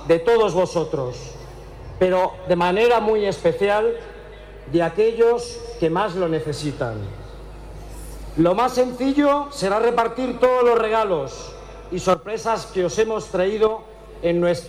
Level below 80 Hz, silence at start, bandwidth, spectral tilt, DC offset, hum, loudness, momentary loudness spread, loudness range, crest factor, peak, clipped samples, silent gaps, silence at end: -42 dBFS; 0 s; 14 kHz; -5.5 dB/octave; under 0.1%; none; -20 LUFS; 21 LU; 4 LU; 16 dB; -6 dBFS; under 0.1%; none; 0 s